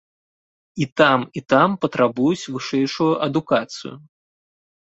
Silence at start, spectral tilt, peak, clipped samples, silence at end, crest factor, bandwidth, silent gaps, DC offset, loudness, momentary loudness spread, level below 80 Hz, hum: 0.75 s; -5.5 dB/octave; -2 dBFS; under 0.1%; 0.95 s; 20 dB; 8 kHz; 0.92-0.96 s; under 0.1%; -19 LUFS; 14 LU; -64 dBFS; none